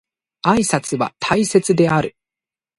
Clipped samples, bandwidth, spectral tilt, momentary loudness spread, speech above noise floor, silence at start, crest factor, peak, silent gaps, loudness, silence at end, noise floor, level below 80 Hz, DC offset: under 0.1%; 11.5 kHz; -5 dB/octave; 7 LU; 73 dB; 0.45 s; 18 dB; 0 dBFS; none; -17 LUFS; 0.7 s; -90 dBFS; -50 dBFS; under 0.1%